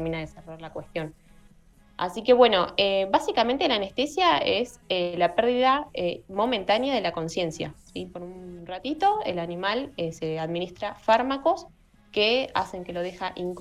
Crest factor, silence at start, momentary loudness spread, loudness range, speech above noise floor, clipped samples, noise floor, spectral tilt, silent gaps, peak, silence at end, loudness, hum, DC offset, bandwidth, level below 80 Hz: 20 dB; 0 s; 15 LU; 6 LU; 30 dB; under 0.1%; -55 dBFS; -4.5 dB/octave; none; -6 dBFS; 0 s; -25 LUFS; none; under 0.1%; 12.5 kHz; -56 dBFS